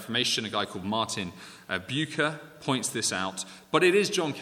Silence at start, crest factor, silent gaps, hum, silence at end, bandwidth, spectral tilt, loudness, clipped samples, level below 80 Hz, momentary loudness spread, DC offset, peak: 0 s; 22 dB; none; none; 0 s; 17 kHz; -3 dB/octave; -28 LUFS; under 0.1%; -70 dBFS; 12 LU; under 0.1%; -8 dBFS